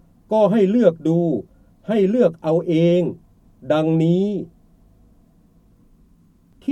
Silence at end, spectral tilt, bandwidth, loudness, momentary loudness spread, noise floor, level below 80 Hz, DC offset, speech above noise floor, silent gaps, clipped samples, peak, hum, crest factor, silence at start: 0 s; -9 dB/octave; 8.2 kHz; -19 LUFS; 11 LU; -54 dBFS; -56 dBFS; under 0.1%; 37 dB; none; under 0.1%; -2 dBFS; none; 18 dB; 0.3 s